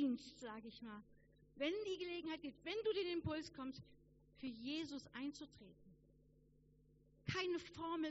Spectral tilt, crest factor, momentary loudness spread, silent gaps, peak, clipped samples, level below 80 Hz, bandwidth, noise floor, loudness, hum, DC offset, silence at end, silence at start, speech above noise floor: -3.5 dB/octave; 18 dB; 14 LU; none; -30 dBFS; under 0.1%; -72 dBFS; 7.6 kHz; -72 dBFS; -46 LUFS; none; under 0.1%; 0 s; 0 s; 25 dB